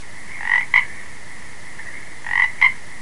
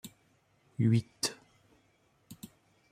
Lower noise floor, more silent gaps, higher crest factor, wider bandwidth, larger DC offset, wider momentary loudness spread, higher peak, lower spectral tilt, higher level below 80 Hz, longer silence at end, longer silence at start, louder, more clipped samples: second, -39 dBFS vs -70 dBFS; neither; about the same, 22 dB vs 20 dB; second, 11.5 kHz vs 15.5 kHz; first, 5% vs under 0.1%; second, 22 LU vs 25 LU; first, 0 dBFS vs -16 dBFS; second, -1.5 dB/octave vs -5 dB/octave; first, -54 dBFS vs -70 dBFS; second, 0 s vs 0.45 s; about the same, 0 s vs 0.05 s; first, -17 LUFS vs -31 LUFS; neither